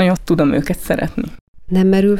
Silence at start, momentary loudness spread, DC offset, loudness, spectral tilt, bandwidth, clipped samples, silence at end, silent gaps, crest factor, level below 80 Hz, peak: 0 s; 10 LU; under 0.1%; -17 LUFS; -7 dB/octave; 15.5 kHz; under 0.1%; 0 s; 1.41-1.54 s; 12 dB; -34 dBFS; -2 dBFS